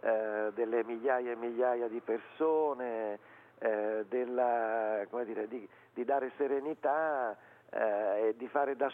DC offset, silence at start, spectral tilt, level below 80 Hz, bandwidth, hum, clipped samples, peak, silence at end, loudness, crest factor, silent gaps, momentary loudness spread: under 0.1%; 0.05 s; -7.5 dB/octave; under -90 dBFS; 3.8 kHz; none; under 0.1%; -18 dBFS; 0 s; -34 LUFS; 16 dB; none; 8 LU